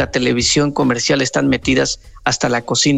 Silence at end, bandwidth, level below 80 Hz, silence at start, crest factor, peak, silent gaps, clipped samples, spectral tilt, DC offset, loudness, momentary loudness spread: 0 s; 10 kHz; -38 dBFS; 0 s; 14 dB; -2 dBFS; none; under 0.1%; -3.5 dB/octave; under 0.1%; -16 LUFS; 5 LU